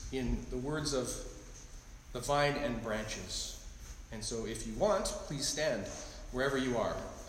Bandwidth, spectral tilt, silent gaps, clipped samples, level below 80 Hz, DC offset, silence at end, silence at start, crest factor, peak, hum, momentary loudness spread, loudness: 16 kHz; -4 dB/octave; none; under 0.1%; -48 dBFS; under 0.1%; 0 s; 0 s; 18 dB; -18 dBFS; none; 17 LU; -36 LUFS